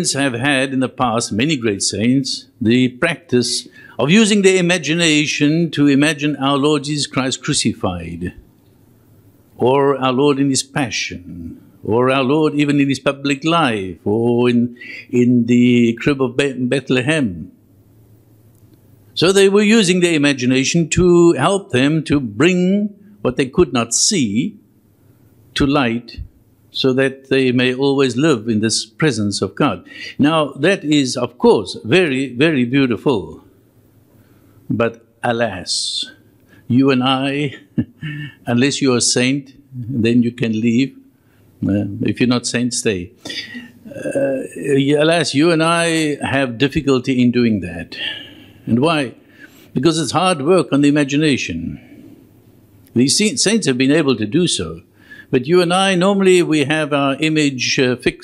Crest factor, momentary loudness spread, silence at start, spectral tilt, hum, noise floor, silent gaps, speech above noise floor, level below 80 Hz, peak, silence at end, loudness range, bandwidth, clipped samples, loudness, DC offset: 16 dB; 12 LU; 0 s; -4.5 dB/octave; none; -51 dBFS; none; 36 dB; -46 dBFS; 0 dBFS; 0 s; 5 LU; 12.5 kHz; under 0.1%; -16 LUFS; under 0.1%